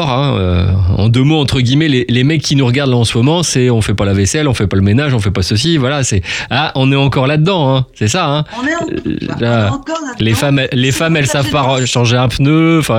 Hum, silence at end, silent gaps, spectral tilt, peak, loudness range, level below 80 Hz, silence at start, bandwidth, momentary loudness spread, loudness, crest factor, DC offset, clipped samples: none; 0 s; none; -5.5 dB/octave; 0 dBFS; 3 LU; -34 dBFS; 0 s; 15.5 kHz; 5 LU; -12 LUFS; 12 dB; under 0.1%; under 0.1%